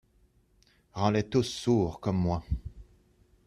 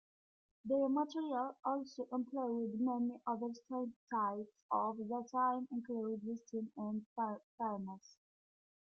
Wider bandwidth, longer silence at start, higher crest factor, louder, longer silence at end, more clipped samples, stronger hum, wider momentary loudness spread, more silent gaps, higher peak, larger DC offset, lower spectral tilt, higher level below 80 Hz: first, 13 kHz vs 6.8 kHz; first, 0.95 s vs 0.65 s; about the same, 20 dB vs 16 dB; first, -29 LUFS vs -40 LUFS; second, 0.65 s vs 0.85 s; neither; neither; about the same, 10 LU vs 8 LU; second, none vs 3.96-4.07 s, 4.62-4.69 s, 7.06-7.16 s, 7.44-7.58 s; first, -10 dBFS vs -24 dBFS; neither; about the same, -6.5 dB/octave vs -7 dB/octave; first, -46 dBFS vs -86 dBFS